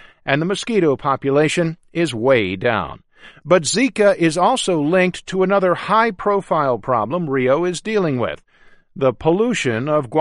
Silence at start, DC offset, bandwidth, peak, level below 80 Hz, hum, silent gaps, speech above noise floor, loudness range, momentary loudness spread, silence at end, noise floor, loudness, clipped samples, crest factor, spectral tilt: 0.25 s; under 0.1%; 11.5 kHz; 0 dBFS; -50 dBFS; none; none; 32 dB; 3 LU; 5 LU; 0 s; -49 dBFS; -18 LUFS; under 0.1%; 18 dB; -5 dB/octave